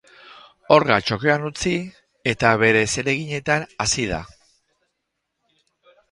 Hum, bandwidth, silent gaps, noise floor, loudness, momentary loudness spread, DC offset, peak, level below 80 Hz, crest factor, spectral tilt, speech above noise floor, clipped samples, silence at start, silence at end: none; 11.5 kHz; none; -77 dBFS; -20 LUFS; 11 LU; under 0.1%; 0 dBFS; -48 dBFS; 22 dB; -4 dB/octave; 58 dB; under 0.1%; 0.3 s; 1.85 s